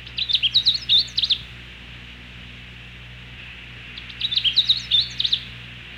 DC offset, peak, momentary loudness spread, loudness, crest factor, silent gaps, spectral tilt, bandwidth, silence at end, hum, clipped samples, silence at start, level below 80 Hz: under 0.1%; -8 dBFS; 22 LU; -18 LUFS; 16 dB; none; -1.5 dB/octave; 16 kHz; 0 s; 60 Hz at -45 dBFS; under 0.1%; 0 s; -46 dBFS